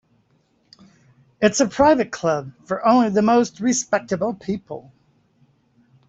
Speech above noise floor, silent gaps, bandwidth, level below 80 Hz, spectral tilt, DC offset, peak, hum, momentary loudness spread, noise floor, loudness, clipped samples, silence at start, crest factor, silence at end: 44 dB; none; 8.2 kHz; -54 dBFS; -4.5 dB/octave; under 0.1%; -4 dBFS; none; 12 LU; -63 dBFS; -20 LUFS; under 0.1%; 1.4 s; 18 dB; 1.3 s